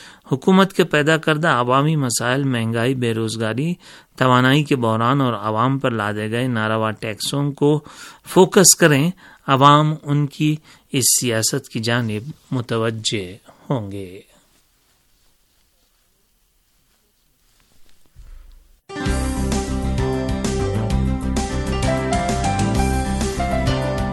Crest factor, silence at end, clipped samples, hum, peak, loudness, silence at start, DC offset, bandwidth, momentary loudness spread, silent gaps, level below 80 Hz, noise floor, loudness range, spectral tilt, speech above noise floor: 20 dB; 0 s; under 0.1%; none; 0 dBFS; -18 LUFS; 0 s; under 0.1%; 16.5 kHz; 11 LU; none; -32 dBFS; -61 dBFS; 12 LU; -4.5 dB/octave; 43 dB